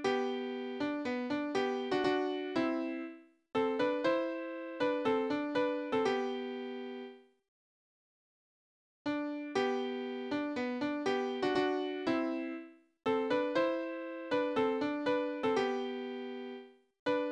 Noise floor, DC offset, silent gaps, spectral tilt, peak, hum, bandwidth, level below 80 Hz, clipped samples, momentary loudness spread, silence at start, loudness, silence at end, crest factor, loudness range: under -90 dBFS; under 0.1%; 7.48-9.05 s, 16.99-17.06 s; -5 dB/octave; -18 dBFS; none; 9.8 kHz; -76 dBFS; under 0.1%; 10 LU; 0 s; -35 LUFS; 0 s; 16 dB; 6 LU